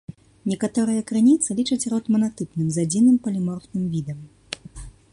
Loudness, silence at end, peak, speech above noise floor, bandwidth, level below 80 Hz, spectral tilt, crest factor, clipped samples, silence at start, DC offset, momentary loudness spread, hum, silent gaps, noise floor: -22 LUFS; 0.25 s; -6 dBFS; 19 dB; 11.5 kHz; -52 dBFS; -5.5 dB/octave; 16 dB; under 0.1%; 0.1 s; under 0.1%; 17 LU; none; none; -40 dBFS